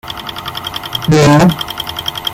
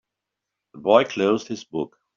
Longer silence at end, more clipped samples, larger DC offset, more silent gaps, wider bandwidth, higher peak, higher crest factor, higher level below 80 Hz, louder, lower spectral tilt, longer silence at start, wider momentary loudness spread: second, 0 s vs 0.3 s; neither; neither; neither; first, 16.5 kHz vs 7.4 kHz; first, 0 dBFS vs -4 dBFS; second, 14 dB vs 20 dB; first, -38 dBFS vs -66 dBFS; first, -13 LUFS vs -22 LUFS; first, -5.5 dB/octave vs -3.5 dB/octave; second, 0.05 s vs 0.75 s; about the same, 14 LU vs 13 LU